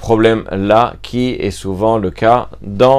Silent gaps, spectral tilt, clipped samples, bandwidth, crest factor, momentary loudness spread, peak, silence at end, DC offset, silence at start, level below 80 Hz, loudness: none; -6.5 dB/octave; 0.1%; 14.5 kHz; 14 dB; 8 LU; 0 dBFS; 0 s; under 0.1%; 0 s; -36 dBFS; -14 LUFS